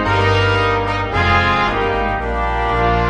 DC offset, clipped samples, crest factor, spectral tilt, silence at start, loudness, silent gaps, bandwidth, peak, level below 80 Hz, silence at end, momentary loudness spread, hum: under 0.1%; under 0.1%; 14 dB; -6 dB/octave; 0 s; -16 LUFS; none; 9.6 kHz; -2 dBFS; -26 dBFS; 0 s; 5 LU; none